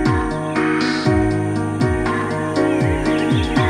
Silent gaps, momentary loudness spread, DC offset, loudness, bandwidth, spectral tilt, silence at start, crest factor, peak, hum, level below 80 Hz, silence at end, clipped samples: none; 4 LU; under 0.1%; -18 LUFS; 11 kHz; -6.5 dB/octave; 0 s; 14 dB; -4 dBFS; none; -32 dBFS; 0 s; under 0.1%